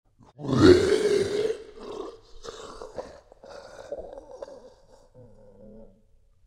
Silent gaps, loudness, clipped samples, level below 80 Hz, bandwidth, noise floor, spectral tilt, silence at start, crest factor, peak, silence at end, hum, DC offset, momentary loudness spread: none; -22 LUFS; under 0.1%; -52 dBFS; 12 kHz; -59 dBFS; -6 dB/octave; 0.4 s; 24 dB; -4 dBFS; 1.9 s; none; under 0.1%; 27 LU